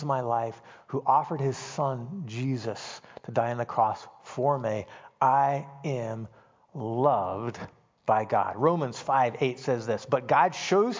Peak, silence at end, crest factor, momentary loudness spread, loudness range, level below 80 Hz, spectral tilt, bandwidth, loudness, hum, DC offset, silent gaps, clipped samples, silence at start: -10 dBFS; 0 s; 18 dB; 15 LU; 4 LU; -66 dBFS; -6 dB/octave; 7.6 kHz; -28 LUFS; none; under 0.1%; none; under 0.1%; 0 s